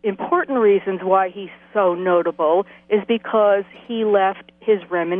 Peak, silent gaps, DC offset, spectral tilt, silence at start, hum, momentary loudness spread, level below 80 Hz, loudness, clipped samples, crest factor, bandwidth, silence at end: -2 dBFS; none; under 0.1%; -9 dB/octave; 0.05 s; none; 7 LU; -66 dBFS; -19 LUFS; under 0.1%; 16 dB; 3.7 kHz; 0 s